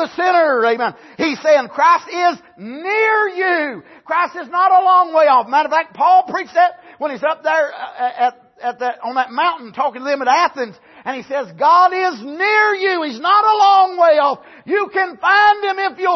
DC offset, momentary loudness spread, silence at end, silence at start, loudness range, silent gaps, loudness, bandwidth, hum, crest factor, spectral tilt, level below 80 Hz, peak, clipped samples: under 0.1%; 12 LU; 0 s; 0 s; 6 LU; none; -15 LUFS; 6.2 kHz; none; 14 dB; -3 dB/octave; -70 dBFS; -2 dBFS; under 0.1%